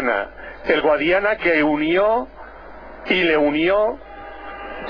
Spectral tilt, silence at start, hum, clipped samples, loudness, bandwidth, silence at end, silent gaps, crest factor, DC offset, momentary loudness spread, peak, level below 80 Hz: -7 dB/octave; 0 s; none; under 0.1%; -18 LUFS; 5.4 kHz; 0 s; none; 16 dB; under 0.1%; 19 LU; -4 dBFS; -46 dBFS